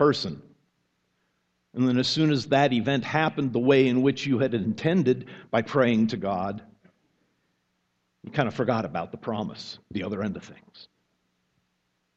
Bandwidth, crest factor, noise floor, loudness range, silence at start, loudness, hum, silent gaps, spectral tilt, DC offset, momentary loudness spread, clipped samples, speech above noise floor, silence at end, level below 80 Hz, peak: 8.2 kHz; 20 dB; -75 dBFS; 9 LU; 0 s; -25 LUFS; none; none; -6.5 dB/octave; under 0.1%; 12 LU; under 0.1%; 50 dB; 1.35 s; -64 dBFS; -6 dBFS